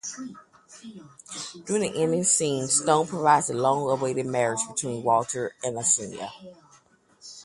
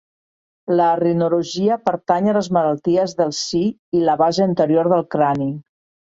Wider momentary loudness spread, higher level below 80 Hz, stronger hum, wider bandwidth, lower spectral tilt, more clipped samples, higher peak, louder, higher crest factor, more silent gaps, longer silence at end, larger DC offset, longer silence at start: first, 18 LU vs 5 LU; second, -66 dBFS vs -60 dBFS; neither; first, 11.5 kHz vs 8 kHz; second, -3.5 dB/octave vs -6 dB/octave; neither; second, -6 dBFS vs -2 dBFS; second, -24 LUFS vs -18 LUFS; about the same, 20 dB vs 16 dB; second, none vs 3.79-3.92 s; second, 0 s vs 0.5 s; neither; second, 0.05 s vs 0.7 s